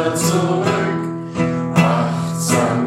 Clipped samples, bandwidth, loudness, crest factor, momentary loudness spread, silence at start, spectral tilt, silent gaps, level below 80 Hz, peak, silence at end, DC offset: under 0.1%; 15.5 kHz; -18 LUFS; 16 dB; 6 LU; 0 s; -5.5 dB/octave; none; -54 dBFS; -2 dBFS; 0 s; under 0.1%